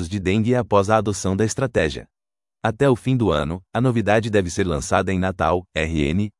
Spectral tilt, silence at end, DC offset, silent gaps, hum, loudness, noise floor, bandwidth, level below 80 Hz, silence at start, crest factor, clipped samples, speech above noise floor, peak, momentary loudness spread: -6 dB/octave; 0.1 s; under 0.1%; none; none; -21 LUFS; under -90 dBFS; 12 kHz; -42 dBFS; 0 s; 18 dB; under 0.1%; over 70 dB; -2 dBFS; 5 LU